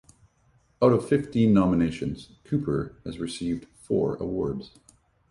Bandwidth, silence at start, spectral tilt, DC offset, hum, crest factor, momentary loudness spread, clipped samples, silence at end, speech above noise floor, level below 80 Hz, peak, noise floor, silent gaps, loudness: 11.5 kHz; 0.8 s; -7.5 dB/octave; under 0.1%; none; 20 dB; 14 LU; under 0.1%; 0.65 s; 39 dB; -50 dBFS; -6 dBFS; -64 dBFS; none; -26 LUFS